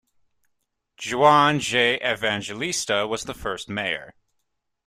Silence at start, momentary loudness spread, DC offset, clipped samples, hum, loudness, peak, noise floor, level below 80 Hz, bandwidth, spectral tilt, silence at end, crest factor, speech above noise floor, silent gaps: 1 s; 13 LU; under 0.1%; under 0.1%; none; -22 LUFS; -4 dBFS; -76 dBFS; -56 dBFS; 15.5 kHz; -3 dB/octave; 0.75 s; 20 dB; 53 dB; none